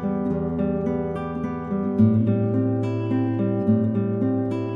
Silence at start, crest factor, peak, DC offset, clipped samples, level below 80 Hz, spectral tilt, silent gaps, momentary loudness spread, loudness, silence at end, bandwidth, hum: 0 s; 16 dB; -6 dBFS; under 0.1%; under 0.1%; -46 dBFS; -11 dB/octave; none; 8 LU; -23 LUFS; 0 s; 4.9 kHz; none